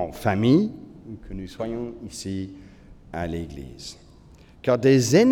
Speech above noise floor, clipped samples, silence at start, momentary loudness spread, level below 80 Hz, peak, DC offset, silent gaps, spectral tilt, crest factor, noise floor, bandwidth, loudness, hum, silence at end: 27 dB; under 0.1%; 0 s; 21 LU; -48 dBFS; -4 dBFS; under 0.1%; none; -6 dB/octave; 20 dB; -50 dBFS; 18 kHz; -23 LUFS; none; 0 s